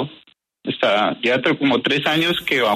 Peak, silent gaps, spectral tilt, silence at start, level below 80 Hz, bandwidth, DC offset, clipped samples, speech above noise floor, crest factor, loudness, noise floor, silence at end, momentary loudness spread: -6 dBFS; none; -5 dB/octave; 0 s; -60 dBFS; 13.5 kHz; under 0.1%; under 0.1%; 35 dB; 14 dB; -18 LUFS; -53 dBFS; 0 s; 10 LU